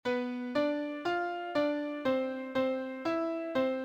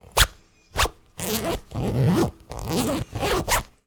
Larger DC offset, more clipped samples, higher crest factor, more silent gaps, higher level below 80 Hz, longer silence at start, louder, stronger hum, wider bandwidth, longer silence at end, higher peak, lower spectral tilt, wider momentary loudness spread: neither; neither; second, 14 dB vs 22 dB; neither; second, -72 dBFS vs -34 dBFS; about the same, 0.05 s vs 0.15 s; second, -33 LUFS vs -25 LUFS; neither; second, 8.8 kHz vs over 20 kHz; second, 0 s vs 0.2 s; second, -18 dBFS vs -2 dBFS; first, -5.5 dB/octave vs -4 dB/octave; second, 3 LU vs 8 LU